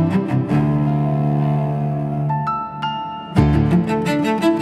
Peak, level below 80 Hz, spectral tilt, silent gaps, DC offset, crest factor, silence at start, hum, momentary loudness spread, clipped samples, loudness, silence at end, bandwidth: 0 dBFS; -36 dBFS; -8 dB/octave; none; under 0.1%; 16 dB; 0 s; none; 7 LU; under 0.1%; -19 LUFS; 0 s; 11 kHz